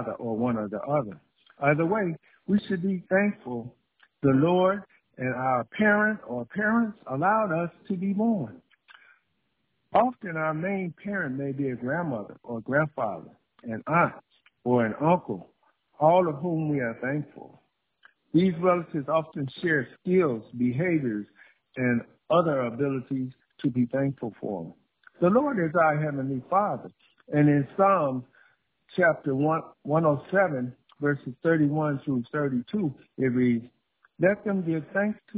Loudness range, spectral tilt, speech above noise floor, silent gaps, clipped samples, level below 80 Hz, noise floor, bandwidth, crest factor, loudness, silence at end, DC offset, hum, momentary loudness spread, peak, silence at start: 4 LU; -11.5 dB/octave; 50 dB; none; under 0.1%; -64 dBFS; -76 dBFS; 4 kHz; 20 dB; -26 LUFS; 0 s; under 0.1%; none; 12 LU; -8 dBFS; 0 s